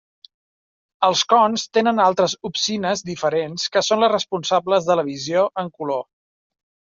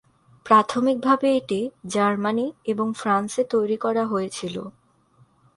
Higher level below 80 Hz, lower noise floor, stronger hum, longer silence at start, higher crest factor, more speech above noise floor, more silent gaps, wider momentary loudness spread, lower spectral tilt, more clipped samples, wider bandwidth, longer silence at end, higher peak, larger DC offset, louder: about the same, -66 dBFS vs -66 dBFS; first, under -90 dBFS vs -59 dBFS; neither; first, 1 s vs 0.45 s; about the same, 18 dB vs 20 dB; first, over 71 dB vs 37 dB; neither; second, 7 LU vs 10 LU; second, -3.5 dB/octave vs -5 dB/octave; neither; second, 7.6 kHz vs 11.5 kHz; about the same, 0.95 s vs 0.85 s; about the same, -4 dBFS vs -4 dBFS; neither; about the same, -20 LUFS vs -22 LUFS